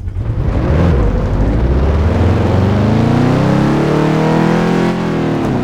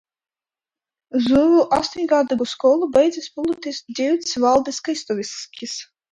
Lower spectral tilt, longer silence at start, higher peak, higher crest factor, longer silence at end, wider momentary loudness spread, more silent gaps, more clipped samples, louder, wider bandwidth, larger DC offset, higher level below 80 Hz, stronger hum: first, -8 dB/octave vs -4 dB/octave; second, 0 s vs 1.15 s; about the same, -2 dBFS vs -4 dBFS; second, 10 dB vs 16 dB; second, 0 s vs 0.3 s; second, 4 LU vs 14 LU; neither; neither; first, -13 LUFS vs -19 LUFS; about the same, 11 kHz vs 11 kHz; neither; first, -20 dBFS vs -56 dBFS; neither